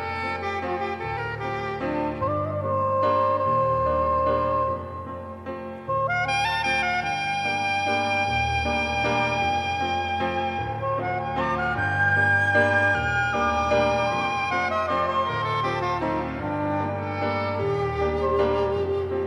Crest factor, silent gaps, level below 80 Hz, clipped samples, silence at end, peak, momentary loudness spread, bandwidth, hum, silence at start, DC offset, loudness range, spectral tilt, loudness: 16 dB; none; -44 dBFS; under 0.1%; 0 s; -8 dBFS; 7 LU; 12.5 kHz; none; 0 s; under 0.1%; 4 LU; -5.5 dB/octave; -24 LUFS